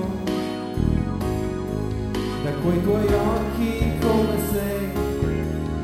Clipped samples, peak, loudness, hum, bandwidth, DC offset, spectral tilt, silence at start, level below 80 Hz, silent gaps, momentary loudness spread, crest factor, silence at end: under 0.1%; -8 dBFS; -24 LUFS; none; 17 kHz; under 0.1%; -7 dB/octave; 0 s; -32 dBFS; none; 6 LU; 14 dB; 0 s